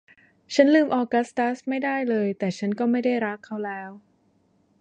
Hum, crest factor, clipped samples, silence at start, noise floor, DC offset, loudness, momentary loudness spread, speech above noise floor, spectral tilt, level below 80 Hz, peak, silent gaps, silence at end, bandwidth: none; 20 dB; under 0.1%; 0.5 s; -64 dBFS; under 0.1%; -24 LUFS; 14 LU; 41 dB; -6 dB/octave; -74 dBFS; -4 dBFS; none; 0.8 s; 9.2 kHz